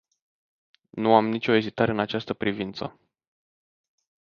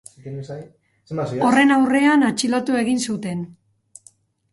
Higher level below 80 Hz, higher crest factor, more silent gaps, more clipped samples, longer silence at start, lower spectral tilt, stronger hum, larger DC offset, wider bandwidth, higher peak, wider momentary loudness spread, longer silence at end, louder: about the same, -62 dBFS vs -62 dBFS; first, 24 dB vs 16 dB; neither; neither; first, 0.95 s vs 0.25 s; first, -7.5 dB/octave vs -4.5 dB/octave; neither; neither; second, 6.8 kHz vs 11.5 kHz; about the same, -4 dBFS vs -4 dBFS; second, 15 LU vs 20 LU; first, 1.45 s vs 1 s; second, -24 LUFS vs -18 LUFS